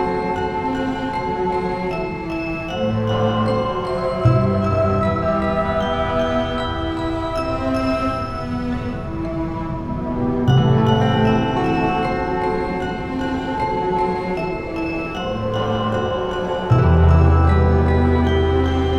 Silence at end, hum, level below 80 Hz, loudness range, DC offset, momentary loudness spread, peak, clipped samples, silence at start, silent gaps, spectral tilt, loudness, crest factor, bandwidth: 0 s; none; -28 dBFS; 5 LU; under 0.1%; 9 LU; -2 dBFS; under 0.1%; 0 s; none; -8 dB/octave; -20 LUFS; 16 dB; 8.8 kHz